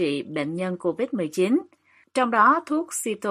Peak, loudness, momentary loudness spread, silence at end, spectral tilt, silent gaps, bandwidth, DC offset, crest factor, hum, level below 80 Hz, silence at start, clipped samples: -6 dBFS; -24 LUFS; 10 LU; 0 s; -4.5 dB/octave; none; 15.5 kHz; under 0.1%; 18 dB; none; -74 dBFS; 0 s; under 0.1%